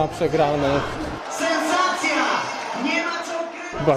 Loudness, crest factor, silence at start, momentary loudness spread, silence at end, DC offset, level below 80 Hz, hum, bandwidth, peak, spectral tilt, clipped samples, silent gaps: -22 LUFS; 16 dB; 0 s; 9 LU; 0 s; under 0.1%; -46 dBFS; none; 14.5 kHz; -6 dBFS; -4 dB/octave; under 0.1%; none